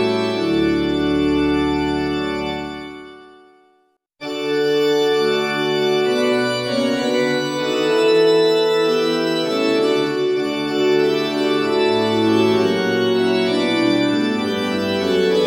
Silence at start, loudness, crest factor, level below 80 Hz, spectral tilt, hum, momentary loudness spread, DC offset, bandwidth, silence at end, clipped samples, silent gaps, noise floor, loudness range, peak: 0 s; -18 LUFS; 14 dB; -46 dBFS; -5 dB/octave; none; 5 LU; under 0.1%; 16.5 kHz; 0 s; under 0.1%; none; -61 dBFS; 5 LU; -4 dBFS